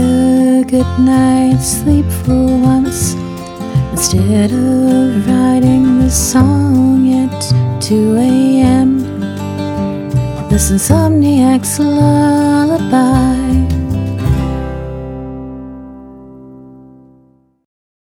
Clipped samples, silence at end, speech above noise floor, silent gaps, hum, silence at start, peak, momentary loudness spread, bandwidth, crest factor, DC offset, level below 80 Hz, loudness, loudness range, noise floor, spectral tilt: under 0.1%; 1.3 s; 40 dB; none; none; 0 s; 0 dBFS; 11 LU; 16.5 kHz; 12 dB; under 0.1%; -26 dBFS; -12 LUFS; 8 LU; -50 dBFS; -6 dB/octave